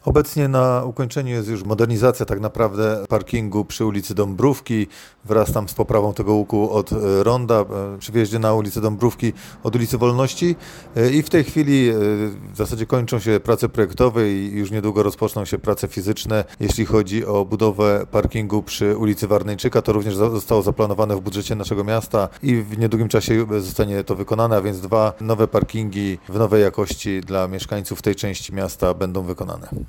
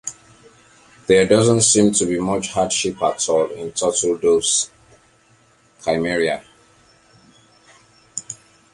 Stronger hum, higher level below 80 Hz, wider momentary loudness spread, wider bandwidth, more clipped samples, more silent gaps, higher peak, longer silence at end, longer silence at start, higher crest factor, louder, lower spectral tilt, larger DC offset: neither; first, -38 dBFS vs -52 dBFS; second, 7 LU vs 18 LU; first, 17.5 kHz vs 11.5 kHz; neither; neither; about the same, -4 dBFS vs -2 dBFS; second, 0 s vs 0.4 s; about the same, 0.05 s vs 0.05 s; about the same, 16 dB vs 18 dB; about the same, -20 LUFS vs -18 LUFS; first, -6.5 dB/octave vs -3.5 dB/octave; neither